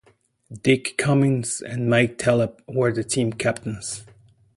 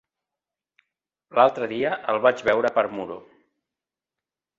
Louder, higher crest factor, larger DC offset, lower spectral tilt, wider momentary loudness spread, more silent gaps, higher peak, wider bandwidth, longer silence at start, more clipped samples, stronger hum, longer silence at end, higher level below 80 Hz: about the same, -22 LUFS vs -22 LUFS; about the same, 20 dB vs 22 dB; neither; about the same, -5 dB/octave vs -5.5 dB/octave; second, 10 LU vs 13 LU; neither; about the same, -4 dBFS vs -4 dBFS; first, 11.5 kHz vs 7.6 kHz; second, 0.5 s vs 1.35 s; neither; neither; second, 0.55 s vs 1.4 s; first, -56 dBFS vs -68 dBFS